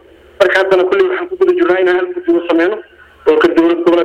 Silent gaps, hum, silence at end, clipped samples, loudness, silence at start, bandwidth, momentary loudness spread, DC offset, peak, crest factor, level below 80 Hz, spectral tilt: none; none; 0 s; under 0.1%; -12 LUFS; 0.4 s; 8.6 kHz; 5 LU; under 0.1%; 0 dBFS; 12 dB; -50 dBFS; -5 dB/octave